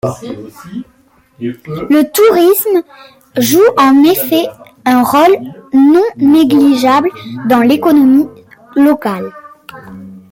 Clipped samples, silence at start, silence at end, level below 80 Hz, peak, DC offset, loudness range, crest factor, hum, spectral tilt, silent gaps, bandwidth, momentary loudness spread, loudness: under 0.1%; 0.05 s; 0.15 s; -52 dBFS; 0 dBFS; under 0.1%; 3 LU; 10 dB; none; -5 dB/octave; none; 17 kHz; 18 LU; -10 LUFS